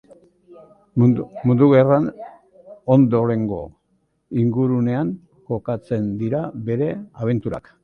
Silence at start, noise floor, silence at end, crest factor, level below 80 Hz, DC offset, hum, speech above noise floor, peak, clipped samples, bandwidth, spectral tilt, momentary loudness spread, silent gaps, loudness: 0.5 s; -67 dBFS; 0.25 s; 18 dB; -52 dBFS; under 0.1%; none; 48 dB; -2 dBFS; under 0.1%; 4.3 kHz; -11 dB/octave; 15 LU; none; -20 LUFS